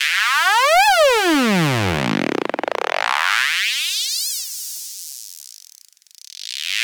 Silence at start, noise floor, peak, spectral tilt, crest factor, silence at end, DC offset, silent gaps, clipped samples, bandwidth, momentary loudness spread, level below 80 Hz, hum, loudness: 0 s; -49 dBFS; -4 dBFS; -3 dB/octave; 16 dB; 0 s; under 0.1%; none; under 0.1%; over 20 kHz; 19 LU; -52 dBFS; none; -17 LUFS